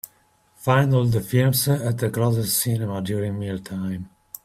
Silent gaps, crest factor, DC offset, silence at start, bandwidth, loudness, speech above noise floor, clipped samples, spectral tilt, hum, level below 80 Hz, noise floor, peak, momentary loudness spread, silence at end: none; 18 dB; under 0.1%; 0.6 s; 16 kHz; -22 LUFS; 39 dB; under 0.1%; -5.5 dB/octave; none; -54 dBFS; -60 dBFS; -4 dBFS; 11 LU; 0.35 s